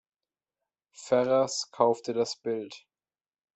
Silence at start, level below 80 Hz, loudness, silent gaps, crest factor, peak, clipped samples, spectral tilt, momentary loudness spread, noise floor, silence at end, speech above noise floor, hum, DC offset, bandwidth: 1 s; -78 dBFS; -28 LUFS; none; 22 dB; -8 dBFS; under 0.1%; -4 dB/octave; 12 LU; under -90 dBFS; 0.8 s; over 63 dB; none; under 0.1%; 8.4 kHz